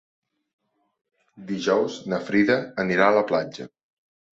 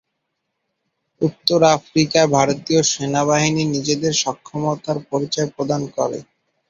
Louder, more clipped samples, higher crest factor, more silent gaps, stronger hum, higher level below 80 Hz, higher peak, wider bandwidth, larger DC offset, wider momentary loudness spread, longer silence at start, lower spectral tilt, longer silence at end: second, -23 LUFS vs -19 LUFS; neither; about the same, 22 dB vs 20 dB; neither; neither; second, -68 dBFS vs -56 dBFS; second, -4 dBFS vs 0 dBFS; second, 8 kHz vs 13 kHz; neither; first, 15 LU vs 9 LU; first, 1.35 s vs 1.2 s; first, -6 dB/octave vs -4 dB/octave; first, 0.65 s vs 0.45 s